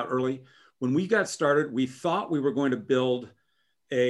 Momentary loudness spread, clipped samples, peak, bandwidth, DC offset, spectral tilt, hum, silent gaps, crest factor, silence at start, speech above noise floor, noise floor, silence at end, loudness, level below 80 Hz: 7 LU; under 0.1%; -10 dBFS; 12 kHz; under 0.1%; -5.5 dB/octave; none; none; 18 dB; 0 s; 48 dB; -75 dBFS; 0 s; -27 LUFS; -72 dBFS